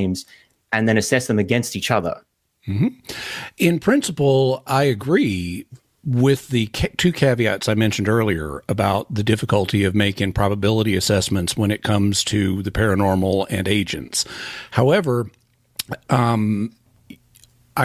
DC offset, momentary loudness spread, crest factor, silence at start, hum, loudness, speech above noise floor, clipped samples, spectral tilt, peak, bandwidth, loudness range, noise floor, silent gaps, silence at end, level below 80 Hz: under 0.1%; 11 LU; 16 dB; 0 s; none; -20 LUFS; 34 dB; under 0.1%; -5.5 dB/octave; -4 dBFS; 16 kHz; 2 LU; -54 dBFS; none; 0 s; -40 dBFS